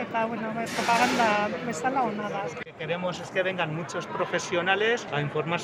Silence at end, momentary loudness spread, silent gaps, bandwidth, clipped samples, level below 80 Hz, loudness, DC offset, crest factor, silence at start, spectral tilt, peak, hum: 0 s; 9 LU; none; 16 kHz; under 0.1%; -68 dBFS; -27 LUFS; under 0.1%; 20 dB; 0 s; -4 dB/octave; -8 dBFS; none